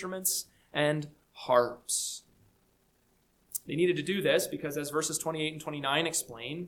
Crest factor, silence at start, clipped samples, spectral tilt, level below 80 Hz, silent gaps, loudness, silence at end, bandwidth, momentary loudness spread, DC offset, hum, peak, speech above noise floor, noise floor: 22 dB; 0 s; under 0.1%; -3 dB/octave; -70 dBFS; none; -31 LUFS; 0 s; 19 kHz; 11 LU; under 0.1%; none; -10 dBFS; 39 dB; -70 dBFS